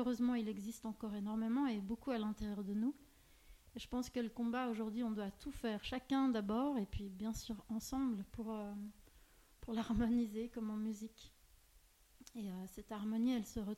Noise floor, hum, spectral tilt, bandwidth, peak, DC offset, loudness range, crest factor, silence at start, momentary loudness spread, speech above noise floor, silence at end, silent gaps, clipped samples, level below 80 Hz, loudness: -68 dBFS; none; -6 dB/octave; 16 kHz; -26 dBFS; under 0.1%; 4 LU; 16 dB; 0 s; 12 LU; 28 dB; 0 s; none; under 0.1%; -60 dBFS; -41 LUFS